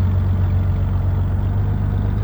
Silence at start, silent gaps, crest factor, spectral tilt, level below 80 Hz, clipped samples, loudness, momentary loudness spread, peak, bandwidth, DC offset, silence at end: 0 s; none; 8 dB; -10 dB/octave; -24 dBFS; under 0.1%; -20 LUFS; 2 LU; -10 dBFS; 3.9 kHz; under 0.1%; 0 s